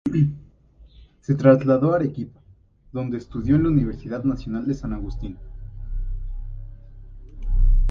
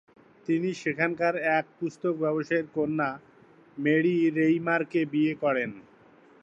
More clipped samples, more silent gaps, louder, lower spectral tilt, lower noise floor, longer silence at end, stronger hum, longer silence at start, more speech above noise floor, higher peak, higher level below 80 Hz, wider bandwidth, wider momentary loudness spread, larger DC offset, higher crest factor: neither; neither; first, -22 LUFS vs -27 LUFS; first, -10 dB/octave vs -7 dB/octave; about the same, -53 dBFS vs -56 dBFS; second, 0 s vs 0.6 s; neither; second, 0.05 s vs 0.5 s; about the same, 32 dB vs 30 dB; first, -2 dBFS vs -10 dBFS; first, -28 dBFS vs -74 dBFS; second, 6.6 kHz vs 7.8 kHz; first, 22 LU vs 8 LU; neither; about the same, 22 dB vs 18 dB